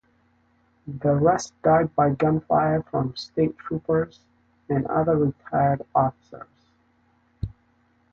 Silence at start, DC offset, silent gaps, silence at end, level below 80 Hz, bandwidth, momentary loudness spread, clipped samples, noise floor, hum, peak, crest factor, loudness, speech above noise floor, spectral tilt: 0.85 s; under 0.1%; none; 0.6 s; -50 dBFS; 8 kHz; 16 LU; under 0.1%; -64 dBFS; none; -6 dBFS; 18 dB; -23 LUFS; 41 dB; -7.5 dB/octave